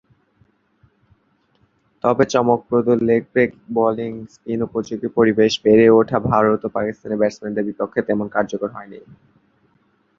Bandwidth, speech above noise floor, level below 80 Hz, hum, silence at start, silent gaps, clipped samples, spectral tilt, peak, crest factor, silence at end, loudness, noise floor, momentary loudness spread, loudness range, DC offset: 7.4 kHz; 44 dB; -54 dBFS; none; 2.05 s; none; under 0.1%; -6.5 dB/octave; -2 dBFS; 18 dB; 1.2 s; -18 LUFS; -62 dBFS; 13 LU; 5 LU; under 0.1%